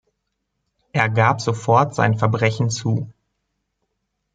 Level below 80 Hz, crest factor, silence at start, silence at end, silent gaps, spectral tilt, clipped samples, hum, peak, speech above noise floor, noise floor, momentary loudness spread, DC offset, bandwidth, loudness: -58 dBFS; 20 dB; 0.95 s; 1.25 s; none; -6 dB/octave; under 0.1%; none; -2 dBFS; 57 dB; -75 dBFS; 8 LU; under 0.1%; 9.2 kHz; -19 LUFS